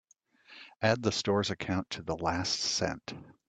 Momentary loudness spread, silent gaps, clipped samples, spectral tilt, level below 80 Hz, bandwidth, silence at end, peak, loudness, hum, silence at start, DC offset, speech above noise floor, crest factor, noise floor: 14 LU; none; under 0.1%; -4 dB/octave; -60 dBFS; 9.4 kHz; 0.15 s; -10 dBFS; -31 LUFS; none; 0.5 s; under 0.1%; 29 dB; 22 dB; -60 dBFS